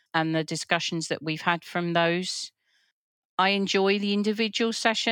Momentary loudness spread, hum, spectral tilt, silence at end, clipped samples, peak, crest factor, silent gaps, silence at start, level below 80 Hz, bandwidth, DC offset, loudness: 7 LU; none; -4 dB/octave; 0 s; under 0.1%; -6 dBFS; 20 dB; 2.92-3.38 s; 0.15 s; -84 dBFS; 17.5 kHz; under 0.1%; -26 LUFS